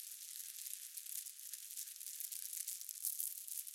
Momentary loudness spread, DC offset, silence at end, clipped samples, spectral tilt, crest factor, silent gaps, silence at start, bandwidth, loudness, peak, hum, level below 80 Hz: 6 LU; under 0.1%; 0 s; under 0.1%; 9.5 dB/octave; 28 dB; none; 0 s; 17 kHz; -44 LUFS; -20 dBFS; none; under -90 dBFS